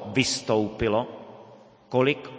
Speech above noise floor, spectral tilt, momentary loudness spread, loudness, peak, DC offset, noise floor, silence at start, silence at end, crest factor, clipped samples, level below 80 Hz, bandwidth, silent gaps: 26 dB; -4.5 dB/octave; 16 LU; -25 LUFS; -6 dBFS; under 0.1%; -50 dBFS; 0 s; 0 s; 20 dB; under 0.1%; -52 dBFS; 8 kHz; none